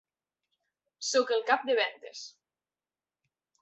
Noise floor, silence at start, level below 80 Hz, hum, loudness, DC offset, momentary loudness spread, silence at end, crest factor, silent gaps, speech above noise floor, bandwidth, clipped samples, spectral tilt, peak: under -90 dBFS; 1 s; -86 dBFS; none; -29 LUFS; under 0.1%; 17 LU; 1.35 s; 22 dB; none; over 61 dB; 8.2 kHz; under 0.1%; 0.5 dB/octave; -10 dBFS